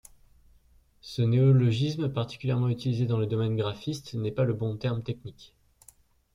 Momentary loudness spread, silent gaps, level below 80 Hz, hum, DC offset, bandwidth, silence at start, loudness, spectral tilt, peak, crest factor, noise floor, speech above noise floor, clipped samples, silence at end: 14 LU; none; -58 dBFS; none; under 0.1%; 11.5 kHz; 1.05 s; -28 LUFS; -8 dB/octave; -12 dBFS; 16 dB; -61 dBFS; 34 dB; under 0.1%; 0.9 s